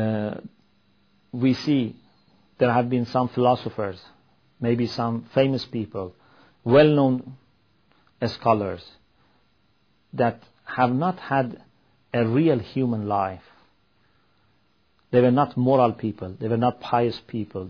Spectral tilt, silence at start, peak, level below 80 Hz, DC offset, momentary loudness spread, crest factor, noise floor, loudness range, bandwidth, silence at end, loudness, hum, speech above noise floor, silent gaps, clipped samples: -8.5 dB/octave; 0 s; -6 dBFS; -62 dBFS; under 0.1%; 14 LU; 20 dB; -66 dBFS; 4 LU; 5.4 kHz; 0 s; -23 LUFS; none; 44 dB; none; under 0.1%